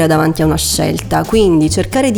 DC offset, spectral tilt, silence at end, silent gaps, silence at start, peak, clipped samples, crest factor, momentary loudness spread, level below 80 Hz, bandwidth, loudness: under 0.1%; -5 dB/octave; 0 s; none; 0 s; 0 dBFS; under 0.1%; 12 dB; 4 LU; -30 dBFS; over 20 kHz; -13 LUFS